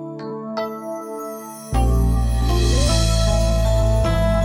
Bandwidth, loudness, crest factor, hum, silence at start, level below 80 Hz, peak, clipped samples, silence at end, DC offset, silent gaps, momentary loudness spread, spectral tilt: 15.5 kHz; -20 LUFS; 12 dB; none; 0 s; -20 dBFS; -6 dBFS; under 0.1%; 0 s; under 0.1%; none; 12 LU; -5.5 dB/octave